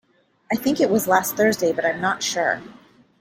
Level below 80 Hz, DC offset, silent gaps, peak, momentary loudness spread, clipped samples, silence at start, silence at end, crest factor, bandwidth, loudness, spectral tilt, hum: -62 dBFS; under 0.1%; none; -2 dBFS; 6 LU; under 0.1%; 0.5 s; 0.45 s; 20 dB; 16.5 kHz; -21 LUFS; -3.5 dB/octave; none